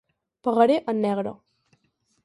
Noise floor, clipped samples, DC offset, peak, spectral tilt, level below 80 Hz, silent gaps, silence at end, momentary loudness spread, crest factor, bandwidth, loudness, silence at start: -70 dBFS; under 0.1%; under 0.1%; -6 dBFS; -7.5 dB/octave; -72 dBFS; none; 0.9 s; 11 LU; 20 dB; 11.5 kHz; -23 LUFS; 0.45 s